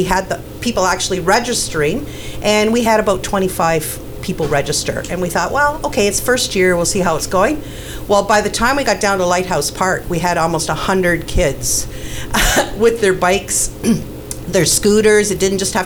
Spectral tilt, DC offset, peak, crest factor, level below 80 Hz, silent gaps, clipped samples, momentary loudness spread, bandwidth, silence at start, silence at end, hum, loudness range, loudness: -3.5 dB/octave; under 0.1%; -2 dBFS; 14 dB; -30 dBFS; none; under 0.1%; 8 LU; over 20 kHz; 0 s; 0 s; none; 2 LU; -15 LUFS